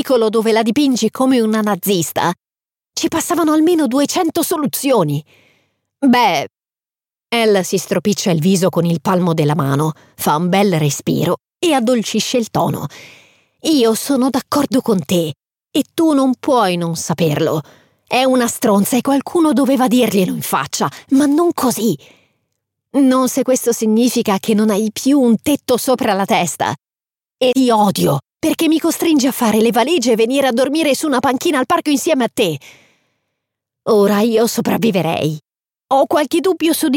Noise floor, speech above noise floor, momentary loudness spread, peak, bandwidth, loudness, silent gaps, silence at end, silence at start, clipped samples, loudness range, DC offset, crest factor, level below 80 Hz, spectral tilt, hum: under -90 dBFS; over 75 dB; 7 LU; -2 dBFS; 17 kHz; -15 LUFS; none; 0 s; 0 s; under 0.1%; 3 LU; under 0.1%; 12 dB; -60 dBFS; -5 dB/octave; none